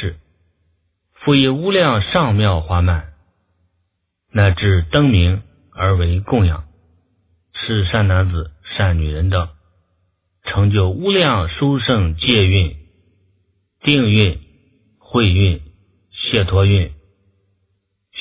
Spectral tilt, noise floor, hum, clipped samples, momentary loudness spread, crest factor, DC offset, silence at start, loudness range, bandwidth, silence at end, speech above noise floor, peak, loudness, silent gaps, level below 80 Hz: -10.5 dB/octave; -70 dBFS; none; under 0.1%; 12 LU; 18 dB; under 0.1%; 0 s; 3 LU; 4 kHz; 0 s; 56 dB; 0 dBFS; -16 LUFS; none; -26 dBFS